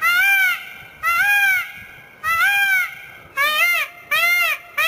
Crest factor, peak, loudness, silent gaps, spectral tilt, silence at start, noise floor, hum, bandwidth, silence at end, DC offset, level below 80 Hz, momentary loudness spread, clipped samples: 14 dB; -6 dBFS; -17 LUFS; none; 1 dB/octave; 0 s; -40 dBFS; none; 16 kHz; 0 s; under 0.1%; -58 dBFS; 14 LU; under 0.1%